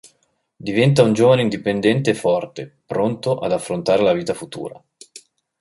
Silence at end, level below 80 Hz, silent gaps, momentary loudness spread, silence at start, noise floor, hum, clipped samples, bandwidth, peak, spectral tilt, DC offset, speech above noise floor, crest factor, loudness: 0.4 s; -56 dBFS; none; 17 LU; 0.6 s; -66 dBFS; none; under 0.1%; 11.5 kHz; -2 dBFS; -6 dB/octave; under 0.1%; 48 dB; 16 dB; -18 LUFS